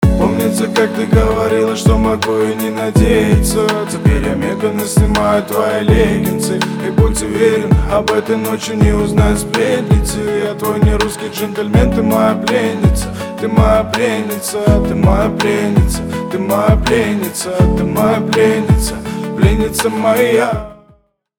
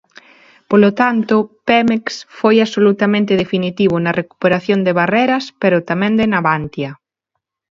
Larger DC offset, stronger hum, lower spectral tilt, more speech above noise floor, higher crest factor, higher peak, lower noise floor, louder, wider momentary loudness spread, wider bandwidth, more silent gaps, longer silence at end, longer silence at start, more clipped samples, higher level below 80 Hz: neither; neither; about the same, -6 dB/octave vs -6.5 dB/octave; second, 38 dB vs 62 dB; about the same, 12 dB vs 16 dB; about the same, 0 dBFS vs 0 dBFS; second, -51 dBFS vs -76 dBFS; about the same, -14 LUFS vs -15 LUFS; about the same, 6 LU vs 6 LU; first, over 20 kHz vs 7.4 kHz; neither; second, 0.65 s vs 0.85 s; second, 0 s vs 0.7 s; neither; first, -22 dBFS vs -54 dBFS